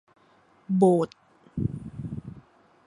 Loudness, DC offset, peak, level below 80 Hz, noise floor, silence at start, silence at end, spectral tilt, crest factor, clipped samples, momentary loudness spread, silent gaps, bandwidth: -26 LUFS; under 0.1%; -8 dBFS; -52 dBFS; -60 dBFS; 0.7 s; 0.5 s; -9.5 dB/octave; 22 dB; under 0.1%; 18 LU; none; 10.5 kHz